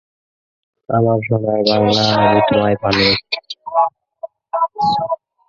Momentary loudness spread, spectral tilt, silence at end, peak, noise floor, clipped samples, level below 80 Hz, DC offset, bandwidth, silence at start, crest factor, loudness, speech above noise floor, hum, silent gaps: 11 LU; -6 dB/octave; 0.35 s; -2 dBFS; -35 dBFS; under 0.1%; -48 dBFS; under 0.1%; 7.4 kHz; 0.9 s; 16 dB; -16 LUFS; 21 dB; none; none